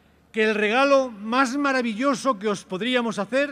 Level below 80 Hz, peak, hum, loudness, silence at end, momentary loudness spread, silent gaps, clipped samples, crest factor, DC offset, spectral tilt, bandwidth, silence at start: -66 dBFS; -6 dBFS; none; -22 LUFS; 0 s; 7 LU; none; under 0.1%; 16 dB; under 0.1%; -4 dB/octave; 12 kHz; 0.35 s